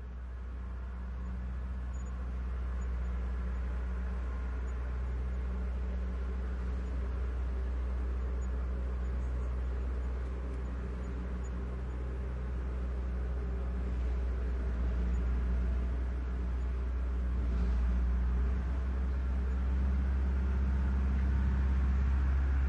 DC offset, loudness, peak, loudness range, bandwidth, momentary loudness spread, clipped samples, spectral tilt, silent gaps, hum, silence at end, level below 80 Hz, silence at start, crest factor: under 0.1%; -36 LUFS; -22 dBFS; 5 LU; 6.6 kHz; 8 LU; under 0.1%; -8.5 dB/octave; none; none; 0 s; -34 dBFS; 0 s; 12 dB